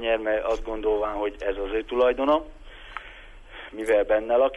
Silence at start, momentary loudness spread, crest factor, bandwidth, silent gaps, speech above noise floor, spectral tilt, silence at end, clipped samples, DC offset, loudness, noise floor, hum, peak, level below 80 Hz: 0 s; 21 LU; 14 dB; 11.5 kHz; none; 21 dB; -5 dB/octave; 0 s; under 0.1%; under 0.1%; -25 LUFS; -44 dBFS; none; -10 dBFS; -42 dBFS